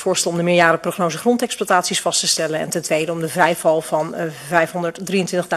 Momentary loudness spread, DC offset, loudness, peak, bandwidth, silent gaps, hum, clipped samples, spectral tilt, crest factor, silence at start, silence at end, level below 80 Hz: 7 LU; under 0.1%; -18 LUFS; 0 dBFS; 14 kHz; none; none; under 0.1%; -3.5 dB/octave; 18 dB; 0 s; 0 s; -62 dBFS